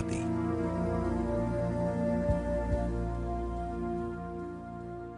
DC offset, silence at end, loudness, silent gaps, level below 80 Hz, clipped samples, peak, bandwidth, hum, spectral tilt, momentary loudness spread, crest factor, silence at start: under 0.1%; 0 s; -33 LUFS; none; -40 dBFS; under 0.1%; -16 dBFS; 10.5 kHz; none; -8.5 dB/octave; 9 LU; 16 dB; 0 s